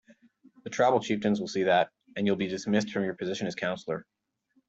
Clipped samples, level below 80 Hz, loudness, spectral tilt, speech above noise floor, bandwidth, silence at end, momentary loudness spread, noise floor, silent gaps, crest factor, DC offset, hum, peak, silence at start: under 0.1%; -70 dBFS; -29 LUFS; -5.5 dB/octave; 44 dB; 8 kHz; 0.65 s; 11 LU; -72 dBFS; none; 20 dB; under 0.1%; none; -10 dBFS; 0.1 s